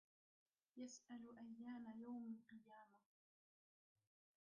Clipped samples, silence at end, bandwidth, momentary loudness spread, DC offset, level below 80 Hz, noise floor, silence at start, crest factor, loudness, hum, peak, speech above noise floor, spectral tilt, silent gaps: under 0.1%; 1.6 s; 6.2 kHz; 12 LU; under 0.1%; under -90 dBFS; under -90 dBFS; 0.75 s; 14 dB; -57 LUFS; none; -46 dBFS; over 33 dB; -5 dB/octave; none